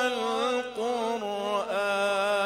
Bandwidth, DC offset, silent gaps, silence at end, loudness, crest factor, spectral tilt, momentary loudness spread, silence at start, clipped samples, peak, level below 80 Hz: 15.5 kHz; under 0.1%; none; 0 s; -28 LUFS; 14 dB; -3 dB/octave; 4 LU; 0 s; under 0.1%; -14 dBFS; -68 dBFS